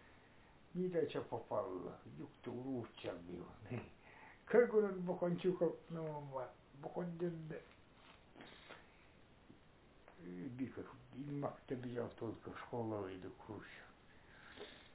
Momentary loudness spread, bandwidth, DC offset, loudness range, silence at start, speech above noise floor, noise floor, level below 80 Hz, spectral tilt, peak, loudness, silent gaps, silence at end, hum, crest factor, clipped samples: 21 LU; 4 kHz; under 0.1%; 13 LU; 0 s; 24 dB; -66 dBFS; -72 dBFS; -6.5 dB/octave; -20 dBFS; -43 LUFS; none; 0 s; none; 24 dB; under 0.1%